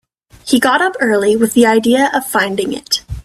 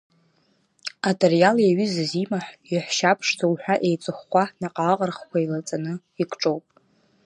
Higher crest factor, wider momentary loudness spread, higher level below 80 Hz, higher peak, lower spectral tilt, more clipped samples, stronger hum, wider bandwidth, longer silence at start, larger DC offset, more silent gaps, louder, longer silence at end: second, 14 dB vs 20 dB; second, 7 LU vs 12 LU; first, -40 dBFS vs -72 dBFS; about the same, 0 dBFS vs -2 dBFS; second, -3.5 dB/octave vs -5 dB/octave; neither; neither; first, 16 kHz vs 11 kHz; second, 0.45 s vs 0.85 s; neither; neither; first, -13 LUFS vs -23 LUFS; second, 0.05 s vs 0.65 s